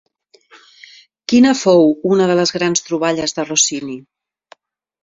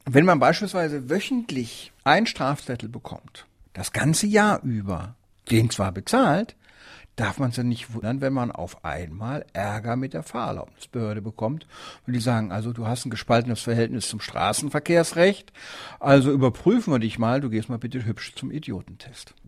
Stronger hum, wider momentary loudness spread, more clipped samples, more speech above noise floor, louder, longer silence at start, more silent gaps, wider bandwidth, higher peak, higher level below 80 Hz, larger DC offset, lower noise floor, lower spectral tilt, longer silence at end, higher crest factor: neither; about the same, 15 LU vs 16 LU; neither; first, 35 dB vs 25 dB; first, -14 LUFS vs -24 LUFS; first, 1.3 s vs 0.05 s; neither; second, 7.8 kHz vs 15 kHz; about the same, 0 dBFS vs -2 dBFS; second, -58 dBFS vs -52 dBFS; neither; about the same, -50 dBFS vs -49 dBFS; second, -3.5 dB/octave vs -5.5 dB/octave; first, 1.05 s vs 0.25 s; second, 16 dB vs 22 dB